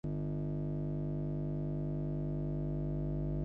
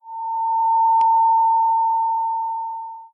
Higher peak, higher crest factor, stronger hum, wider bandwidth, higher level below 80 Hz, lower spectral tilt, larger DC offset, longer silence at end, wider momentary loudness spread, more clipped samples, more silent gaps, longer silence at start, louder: second, -26 dBFS vs -12 dBFS; about the same, 10 dB vs 8 dB; first, 50 Hz at -35 dBFS vs none; second, 2.9 kHz vs 3.3 kHz; first, -46 dBFS vs -82 dBFS; first, -12.5 dB/octave vs -2.5 dB/octave; neither; about the same, 0 s vs 0.05 s; second, 1 LU vs 12 LU; neither; neither; about the same, 0.05 s vs 0.05 s; second, -38 LUFS vs -18 LUFS